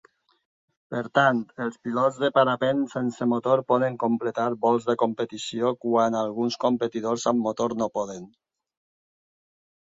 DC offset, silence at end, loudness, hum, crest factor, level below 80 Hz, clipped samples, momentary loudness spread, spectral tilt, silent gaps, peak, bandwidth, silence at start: under 0.1%; 1.65 s; -25 LUFS; none; 18 dB; -68 dBFS; under 0.1%; 9 LU; -5.5 dB/octave; none; -6 dBFS; 7.8 kHz; 0.9 s